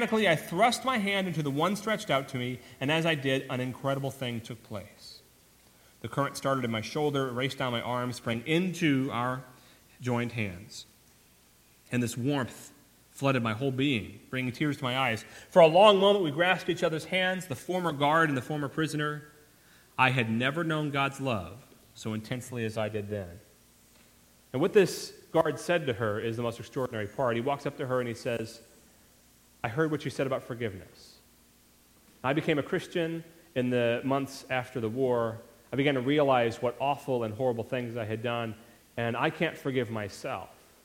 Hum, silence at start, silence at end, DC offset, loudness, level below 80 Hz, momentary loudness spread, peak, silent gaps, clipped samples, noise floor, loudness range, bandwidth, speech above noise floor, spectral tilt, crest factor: none; 0 s; 0.35 s; under 0.1%; -29 LUFS; -66 dBFS; 12 LU; -6 dBFS; none; under 0.1%; -61 dBFS; 10 LU; 16.5 kHz; 32 dB; -5.5 dB/octave; 24 dB